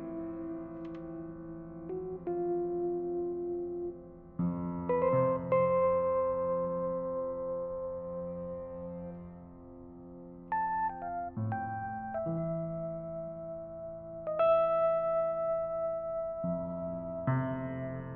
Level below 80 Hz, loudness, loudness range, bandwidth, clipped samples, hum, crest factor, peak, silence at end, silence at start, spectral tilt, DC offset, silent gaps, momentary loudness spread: -60 dBFS; -34 LUFS; 8 LU; 3.5 kHz; under 0.1%; none; 16 dB; -18 dBFS; 0 s; 0 s; -8.5 dB/octave; under 0.1%; none; 15 LU